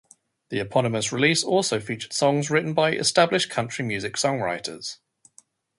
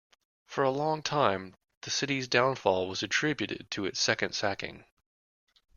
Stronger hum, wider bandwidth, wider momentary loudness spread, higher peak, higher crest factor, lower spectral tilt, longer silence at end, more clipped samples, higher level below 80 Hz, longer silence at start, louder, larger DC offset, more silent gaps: neither; about the same, 11.5 kHz vs 11 kHz; about the same, 11 LU vs 11 LU; first, -4 dBFS vs -8 dBFS; about the same, 20 dB vs 22 dB; about the same, -3.5 dB/octave vs -3.5 dB/octave; about the same, 0.85 s vs 0.95 s; neither; first, -62 dBFS vs -68 dBFS; about the same, 0.5 s vs 0.5 s; first, -23 LUFS vs -29 LUFS; neither; second, none vs 1.77-1.81 s